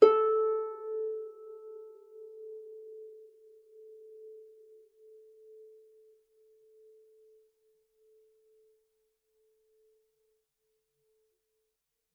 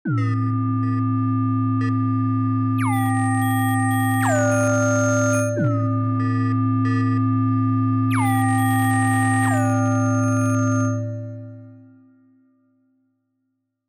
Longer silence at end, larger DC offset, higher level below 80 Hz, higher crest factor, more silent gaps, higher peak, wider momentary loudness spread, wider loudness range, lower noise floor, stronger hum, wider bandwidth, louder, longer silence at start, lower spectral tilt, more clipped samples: first, 7.8 s vs 2.1 s; neither; second, under -90 dBFS vs -62 dBFS; first, 30 dB vs 10 dB; neither; first, -6 dBFS vs -10 dBFS; first, 28 LU vs 3 LU; first, 24 LU vs 4 LU; first, -84 dBFS vs -74 dBFS; neither; second, 5.2 kHz vs 15 kHz; second, -32 LUFS vs -20 LUFS; about the same, 0 s vs 0.05 s; second, -5 dB/octave vs -7 dB/octave; neither